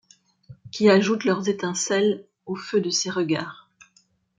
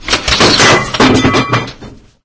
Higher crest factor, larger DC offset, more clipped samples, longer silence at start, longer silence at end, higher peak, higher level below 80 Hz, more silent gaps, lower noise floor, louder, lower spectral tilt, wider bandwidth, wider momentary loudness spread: first, 18 dB vs 10 dB; neither; second, under 0.1% vs 0.2%; first, 0.5 s vs 0 s; first, 0.85 s vs 0.3 s; second, -6 dBFS vs 0 dBFS; second, -70 dBFS vs -28 dBFS; neither; first, -63 dBFS vs -34 dBFS; second, -23 LUFS vs -8 LUFS; about the same, -4 dB/octave vs -3.5 dB/octave; first, 9.4 kHz vs 8 kHz; first, 16 LU vs 10 LU